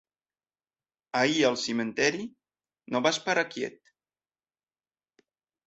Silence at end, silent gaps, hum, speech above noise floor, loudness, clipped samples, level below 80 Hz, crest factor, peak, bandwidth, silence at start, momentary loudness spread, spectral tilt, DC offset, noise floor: 1.95 s; none; none; over 63 dB; -27 LUFS; under 0.1%; -72 dBFS; 24 dB; -8 dBFS; 8.2 kHz; 1.15 s; 13 LU; -3 dB/octave; under 0.1%; under -90 dBFS